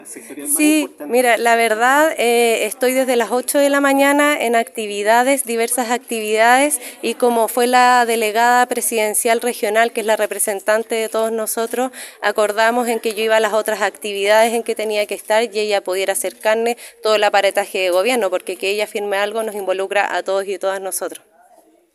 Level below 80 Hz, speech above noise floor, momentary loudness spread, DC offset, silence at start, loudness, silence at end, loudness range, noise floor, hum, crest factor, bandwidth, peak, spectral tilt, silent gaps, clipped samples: -74 dBFS; 35 dB; 8 LU; under 0.1%; 0 s; -17 LUFS; 0.8 s; 4 LU; -51 dBFS; none; 16 dB; 16 kHz; 0 dBFS; -1.5 dB/octave; none; under 0.1%